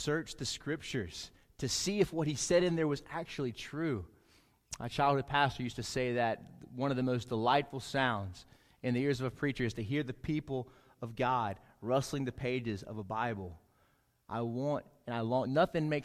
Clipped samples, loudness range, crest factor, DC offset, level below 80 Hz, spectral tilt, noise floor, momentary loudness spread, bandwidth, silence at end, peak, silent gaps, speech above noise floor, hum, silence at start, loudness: under 0.1%; 4 LU; 20 dB; under 0.1%; -60 dBFS; -5 dB/octave; -72 dBFS; 13 LU; 15.5 kHz; 0 s; -16 dBFS; none; 38 dB; none; 0 s; -35 LUFS